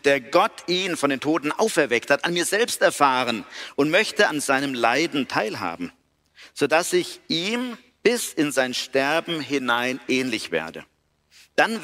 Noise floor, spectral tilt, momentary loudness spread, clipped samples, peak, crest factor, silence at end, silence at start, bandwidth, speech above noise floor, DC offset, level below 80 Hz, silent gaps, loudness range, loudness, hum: -57 dBFS; -3 dB/octave; 9 LU; under 0.1%; -4 dBFS; 20 dB; 0 s; 0.05 s; 16 kHz; 34 dB; under 0.1%; -66 dBFS; none; 4 LU; -22 LUFS; none